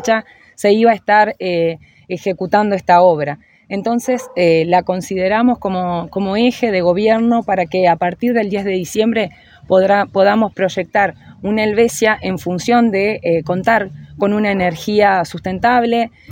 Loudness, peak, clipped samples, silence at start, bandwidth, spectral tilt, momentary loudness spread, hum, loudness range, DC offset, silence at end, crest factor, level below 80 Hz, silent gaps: -15 LUFS; 0 dBFS; under 0.1%; 0 s; 17 kHz; -5.5 dB/octave; 8 LU; none; 1 LU; under 0.1%; 0 s; 14 dB; -50 dBFS; none